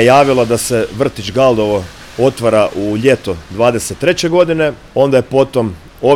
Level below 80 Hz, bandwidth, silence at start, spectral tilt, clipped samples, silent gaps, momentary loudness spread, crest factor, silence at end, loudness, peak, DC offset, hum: -40 dBFS; 16.5 kHz; 0 s; -5 dB/octave; under 0.1%; none; 6 LU; 12 dB; 0 s; -13 LUFS; 0 dBFS; under 0.1%; none